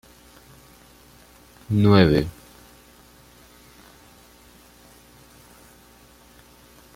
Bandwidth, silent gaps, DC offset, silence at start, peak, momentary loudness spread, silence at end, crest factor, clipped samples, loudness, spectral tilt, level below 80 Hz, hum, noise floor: 16 kHz; none; under 0.1%; 1.7 s; -2 dBFS; 19 LU; 4.65 s; 26 dB; under 0.1%; -19 LUFS; -7.5 dB/octave; -48 dBFS; 60 Hz at -55 dBFS; -51 dBFS